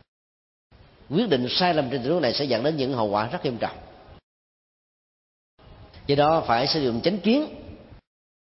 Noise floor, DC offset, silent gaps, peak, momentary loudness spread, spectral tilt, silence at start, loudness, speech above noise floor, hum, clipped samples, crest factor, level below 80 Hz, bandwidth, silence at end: -47 dBFS; under 0.1%; 4.23-5.58 s; -8 dBFS; 11 LU; -8 dB/octave; 1.1 s; -23 LUFS; 24 dB; none; under 0.1%; 18 dB; -54 dBFS; 6 kHz; 0.7 s